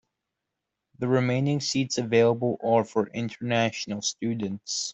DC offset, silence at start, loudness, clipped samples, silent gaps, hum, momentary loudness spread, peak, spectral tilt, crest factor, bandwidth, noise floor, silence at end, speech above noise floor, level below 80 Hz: under 0.1%; 1 s; -26 LUFS; under 0.1%; none; none; 8 LU; -8 dBFS; -5 dB/octave; 18 dB; 8.2 kHz; -84 dBFS; 0 s; 59 dB; -66 dBFS